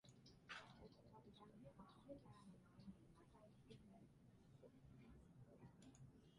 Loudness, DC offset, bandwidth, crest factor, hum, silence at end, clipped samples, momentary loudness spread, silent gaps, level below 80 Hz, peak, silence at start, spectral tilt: -65 LUFS; under 0.1%; 11 kHz; 22 dB; none; 0 s; under 0.1%; 10 LU; none; -78 dBFS; -44 dBFS; 0.05 s; -5.5 dB/octave